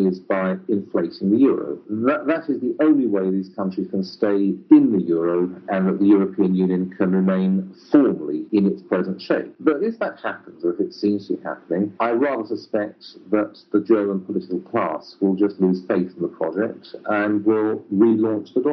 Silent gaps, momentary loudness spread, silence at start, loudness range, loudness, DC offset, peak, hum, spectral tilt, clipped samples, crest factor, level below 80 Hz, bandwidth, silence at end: none; 9 LU; 0 s; 5 LU; -21 LUFS; under 0.1%; -2 dBFS; none; -7.5 dB/octave; under 0.1%; 18 dB; -74 dBFS; 6 kHz; 0 s